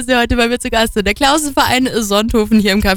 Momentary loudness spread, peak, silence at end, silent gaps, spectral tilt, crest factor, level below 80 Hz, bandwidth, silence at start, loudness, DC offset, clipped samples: 3 LU; 0 dBFS; 0 s; none; -3.5 dB/octave; 12 dB; -28 dBFS; over 20 kHz; 0 s; -13 LUFS; under 0.1%; under 0.1%